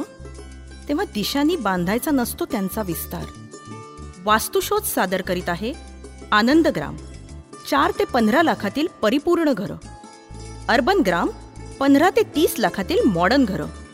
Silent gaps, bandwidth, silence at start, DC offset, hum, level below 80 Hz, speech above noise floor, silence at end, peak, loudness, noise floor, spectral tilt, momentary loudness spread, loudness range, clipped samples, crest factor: none; 16 kHz; 0 s; under 0.1%; none; -42 dBFS; 20 dB; 0 s; -4 dBFS; -20 LUFS; -39 dBFS; -4.5 dB/octave; 22 LU; 4 LU; under 0.1%; 18 dB